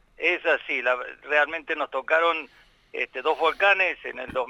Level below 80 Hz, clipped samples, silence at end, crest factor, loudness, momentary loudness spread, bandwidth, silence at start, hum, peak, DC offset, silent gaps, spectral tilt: -62 dBFS; under 0.1%; 0 s; 18 dB; -24 LUFS; 11 LU; 11.5 kHz; 0.2 s; none; -6 dBFS; under 0.1%; none; -3 dB/octave